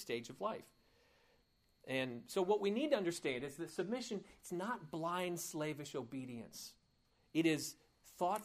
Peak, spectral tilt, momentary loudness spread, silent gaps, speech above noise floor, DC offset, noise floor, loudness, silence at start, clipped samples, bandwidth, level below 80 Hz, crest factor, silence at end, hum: -22 dBFS; -4.5 dB/octave; 13 LU; none; 35 dB; under 0.1%; -76 dBFS; -41 LUFS; 0 s; under 0.1%; 15.5 kHz; -78 dBFS; 20 dB; 0 s; none